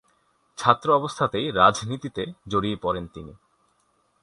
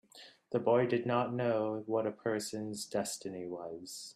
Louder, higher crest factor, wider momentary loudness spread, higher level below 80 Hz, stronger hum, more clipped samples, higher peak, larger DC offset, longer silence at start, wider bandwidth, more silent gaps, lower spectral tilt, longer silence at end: first, -23 LUFS vs -35 LUFS; first, 24 dB vs 18 dB; about the same, 15 LU vs 14 LU; first, -52 dBFS vs -78 dBFS; neither; neither; first, -2 dBFS vs -16 dBFS; neither; first, 0.6 s vs 0.15 s; second, 11.5 kHz vs 15 kHz; neither; about the same, -5 dB/octave vs -5 dB/octave; first, 0.9 s vs 0.05 s